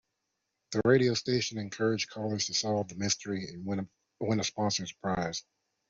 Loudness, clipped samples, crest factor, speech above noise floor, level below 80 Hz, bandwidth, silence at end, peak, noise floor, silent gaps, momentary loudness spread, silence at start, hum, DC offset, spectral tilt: -31 LUFS; under 0.1%; 20 dB; 52 dB; -64 dBFS; 7.8 kHz; 0.5 s; -12 dBFS; -83 dBFS; none; 11 LU; 0.7 s; none; under 0.1%; -4 dB/octave